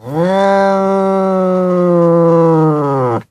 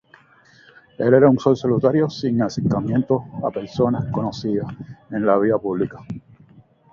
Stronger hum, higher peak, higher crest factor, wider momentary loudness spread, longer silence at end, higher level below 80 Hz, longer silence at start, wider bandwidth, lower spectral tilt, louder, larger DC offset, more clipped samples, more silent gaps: neither; about the same, -2 dBFS vs 0 dBFS; second, 10 dB vs 20 dB; second, 4 LU vs 14 LU; second, 0.1 s vs 0.75 s; about the same, -54 dBFS vs -52 dBFS; second, 0.05 s vs 1 s; first, 10.5 kHz vs 7.2 kHz; about the same, -8.5 dB/octave vs -8 dB/octave; first, -12 LUFS vs -20 LUFS; neither; neither; neither